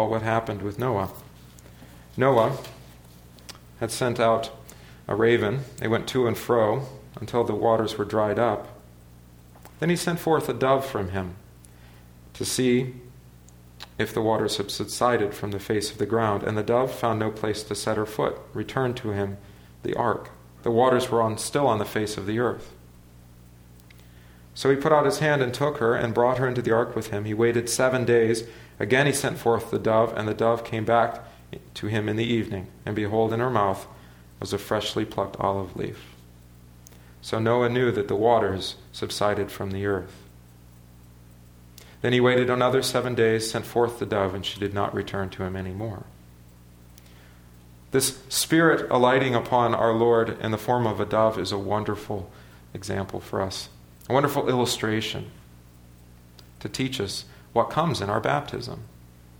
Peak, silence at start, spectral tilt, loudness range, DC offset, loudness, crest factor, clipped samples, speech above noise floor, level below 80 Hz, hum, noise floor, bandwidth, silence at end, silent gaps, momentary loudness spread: -4 dBFS; 0 s; -5 dB/octave; 6 LU; under 0.1%; -25 LUFS; 20 dB; under 0.1%; 26 dB; -54 dBFS; 60 Hz at -50 dBFS; -50 dBFS; over 20 kHz; 0.35 s; none; 14 LU